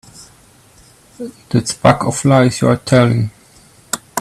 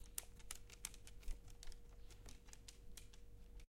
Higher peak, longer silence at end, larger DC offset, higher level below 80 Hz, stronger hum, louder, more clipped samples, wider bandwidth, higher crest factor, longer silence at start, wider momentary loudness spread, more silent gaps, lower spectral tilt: first, 0 dBFS vs -22 dBFS; about the same, 0 s vs 0.05 s; neither; first, -46 dBFS vs -56 dBFS; neither; first, -14 LUFS vs -57 LUFS; neither; second, 14 kHz vs 16.5 kHz; second, 16 dB vs 32 dB; first, 0.2 s vs 0 s; first, 15 LU vs 12 LU; neither; first, -5.5 dB/octave vs -2 dB/octave